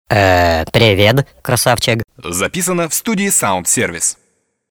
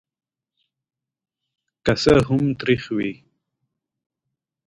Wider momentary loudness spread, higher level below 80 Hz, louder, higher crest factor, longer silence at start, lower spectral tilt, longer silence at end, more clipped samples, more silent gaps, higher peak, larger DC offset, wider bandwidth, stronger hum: second, 7 LU vs 10 LU; first, -38 dBFS vs -46 dBFS; first, -14 LUFS vs -20 LUFS; second, 14 dB vs 22 dB; second, 0.1 s vs 1.85 s; second, -3.5 dB/octave vs -6.5 dB/octave; second, 0.55 s vs 1.55 s; neither; neither; about the same, 0 dBFS vs -2 dBFS; neither; first, over 20 kHz vs 11 kHz; neither